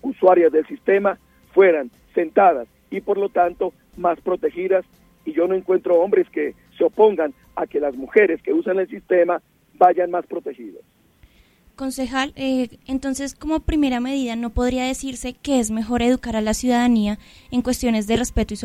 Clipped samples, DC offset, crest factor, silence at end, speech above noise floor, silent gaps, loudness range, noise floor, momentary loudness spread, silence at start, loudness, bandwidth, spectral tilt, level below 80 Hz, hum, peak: under 0.1%; under 0.1%; 18 dB; 0 s; 35 dB; none; 4 LU; -55 dBFS; 11 LU; 0.05 s; -20 LUFS; 15.5 kHz; -5 dB/octave; -40 dBFS; none; -2 dBFS